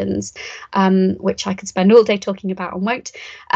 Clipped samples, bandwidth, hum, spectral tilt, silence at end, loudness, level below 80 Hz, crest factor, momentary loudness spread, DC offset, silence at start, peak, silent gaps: under 0.1%; 8 kHz; none; -5.5 dB/octave; 0.15 s; -17 LUFS; -54 dBFS; 18 dB; 17 LU; under 0.1%; 0 s; 0 dBFS; none